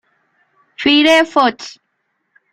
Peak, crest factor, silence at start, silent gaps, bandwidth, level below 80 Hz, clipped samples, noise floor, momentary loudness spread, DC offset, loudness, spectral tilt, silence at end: -2 dBFS; 16 dB; 0.8 s; none; 15.5 kHz; -58 dBFS; under 0.1%; -69 dBFS; 21 LU; under 0.1%; -12 LUFS; -2.5 dB/octave; 0.85 s